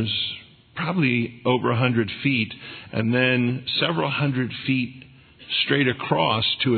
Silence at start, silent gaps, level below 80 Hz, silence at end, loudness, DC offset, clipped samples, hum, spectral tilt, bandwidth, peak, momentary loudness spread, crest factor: 0 s; none; -62 dBFS; 0 s; -23 LUFS; under 0.1%; under 0.1%; none; -9 dB/octave; 4.6 kHz; -6 dBFS; 9 LU; 18 dB